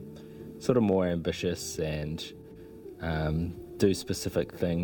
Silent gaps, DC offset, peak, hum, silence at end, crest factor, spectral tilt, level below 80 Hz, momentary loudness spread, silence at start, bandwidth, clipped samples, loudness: none; under 0.1%; -10 dBFS; none; 0 s; 20 dB; -6 dB/octave; -48 dBFS; 19 LU; 0 s; 19 kHz; under 0.1%; -30 LUFS